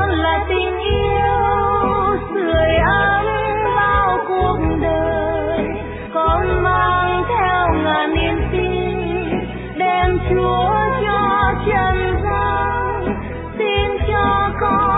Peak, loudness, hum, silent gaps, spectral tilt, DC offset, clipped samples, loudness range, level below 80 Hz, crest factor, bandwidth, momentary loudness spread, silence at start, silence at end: -4 dBFS; -17 LUFS; none; none; -10 dB/octave; under 0.1%; under 0.1%; 2 LU; -28 dBFS; 14 dB; 4 kHz; 6 LU; 0 s; 0 s